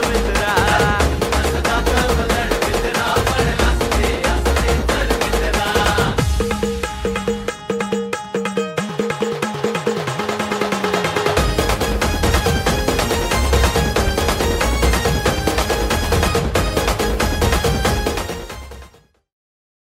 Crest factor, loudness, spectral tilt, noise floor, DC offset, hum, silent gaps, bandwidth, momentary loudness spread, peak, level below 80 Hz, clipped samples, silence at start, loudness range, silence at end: 16 dB; -18 LUFS; -4.5 dB/octave; -47 dBFS; under 0.1%; none; none; 16.5 kHz; 6 LU; -2 dBFS; -24 dBFS; under 0.1%; 0 s; 4 LU; 1.05 s